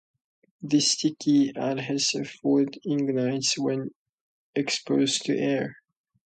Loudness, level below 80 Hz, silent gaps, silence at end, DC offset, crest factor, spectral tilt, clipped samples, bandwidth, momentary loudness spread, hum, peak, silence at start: -25 LUFS; -74 dBFS; 3.95-4.53 s; 0.55 s; under 0.1%; 16 dB; -4 dB/octave; under 0.1%; 9.2 kHz; 8 LU; none; -10 dBFS; 0.6 s